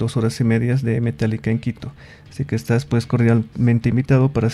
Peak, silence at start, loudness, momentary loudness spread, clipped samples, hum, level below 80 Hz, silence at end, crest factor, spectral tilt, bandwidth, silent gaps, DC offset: -2 dBFS; 0 s; -19 LUFS; 11 LU; under 0.1%; none; -44 dBFS; 0 s; 16 dB; -8 dB/octave; 12.5 kHz; none; under 0.1%